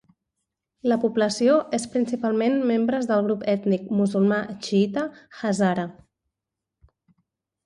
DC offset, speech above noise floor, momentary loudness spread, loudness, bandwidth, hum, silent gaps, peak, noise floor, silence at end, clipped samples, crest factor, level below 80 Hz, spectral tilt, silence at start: under 0.1%; 63 dB; 8 LU; -23 LUFS; 11 kHz; none; none; -8 dBFS; -86 dBFS; 1.75 s; under 0.1%; 16 dB; -66 dBFS; -6 dB/octave; 0.85 s